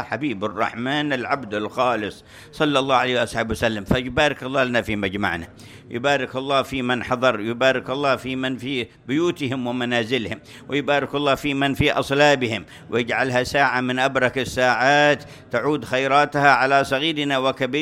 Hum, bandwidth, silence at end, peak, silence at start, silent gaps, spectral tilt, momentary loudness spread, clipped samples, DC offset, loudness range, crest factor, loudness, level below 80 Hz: none; 16 kHz; 0 s; 0 dBFS; 0 s; none; -5 dB/octave; 9 LU; under 0.1%; under 0.1%; 4 LU; 20 dB; -21 LUFS; -48 dBFS